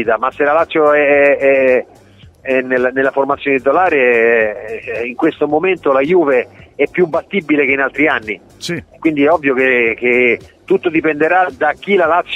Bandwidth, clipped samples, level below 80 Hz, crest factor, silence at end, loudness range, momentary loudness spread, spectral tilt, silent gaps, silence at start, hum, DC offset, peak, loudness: 11 kHz; under 0.1%; -52 dBFS; 14 dB; 0 s; 2 LU; 9 LU; -6 dB/octave; none; 0 s; none; under 0.1%; 0 dBFS; -13 LUFS